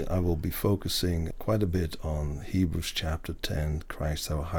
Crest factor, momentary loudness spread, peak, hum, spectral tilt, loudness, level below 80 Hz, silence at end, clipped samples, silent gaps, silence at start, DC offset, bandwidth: 16 dB; 6 LU; -12 dBFS; none; -5.5 dB/octave; -30 LUFS; -38 dBFS; 0 s; under 0.1%; none; 0 s; under 0.1%; 19 kHz